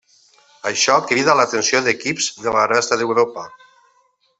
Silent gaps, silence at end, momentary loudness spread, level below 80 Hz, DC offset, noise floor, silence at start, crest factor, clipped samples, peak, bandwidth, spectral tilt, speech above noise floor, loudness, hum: none; 0.85 s; 8 LU; -62 dBFS; under 0.1%; -61 dBFS; 0.65 s; 18 dB; under 0.1%; -2 dBFS; 8.4 kHz; -2 dB/octave; 43 dB; -17 LUFS; none